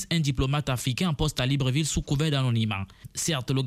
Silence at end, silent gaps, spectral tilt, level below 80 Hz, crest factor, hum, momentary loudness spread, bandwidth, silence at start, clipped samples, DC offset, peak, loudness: 0 s; none; -5 dB/octave; -42 dBFS; 14 dB; none; 5 LU; 15.5 kHz; 0 s; under 0.1%; under 0.1%; -12 dBFS; -26 LUFS